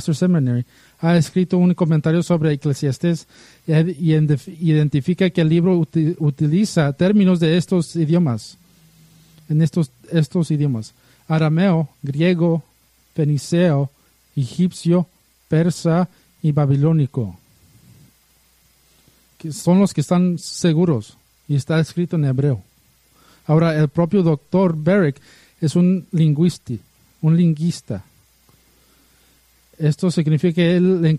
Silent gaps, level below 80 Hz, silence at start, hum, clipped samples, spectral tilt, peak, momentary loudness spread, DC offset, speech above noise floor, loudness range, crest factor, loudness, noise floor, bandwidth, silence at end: none; -56 dBFS; 0 s; none; under 0.1%; -7.5 dB/octave; -4 dBFS; 10 LU; under 0.1%; 40 dB; 5 LU; 16 dB; -18 LUFS; -57 dBFS; 12 kHz; 0 s